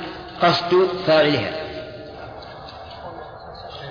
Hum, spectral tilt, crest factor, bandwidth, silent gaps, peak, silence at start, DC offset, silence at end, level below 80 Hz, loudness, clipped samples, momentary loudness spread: none; -6 dB/octave; 18 dB; 5.2 kHz; none; -6 dBFS; 0 s; under 0.1%; 0 s; -50 dBFS; -19 LUFS; under 0.1%; 20 LU